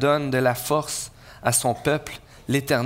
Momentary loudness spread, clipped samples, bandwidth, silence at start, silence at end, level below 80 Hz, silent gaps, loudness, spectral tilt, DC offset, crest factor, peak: 13 LU; under 0.1%; 16 kHz; 0 s; 0 s; -52 dBFS; none; -23 LUFS; -4 dB/octave; under 0.1%; 18 dB; -6 dBFS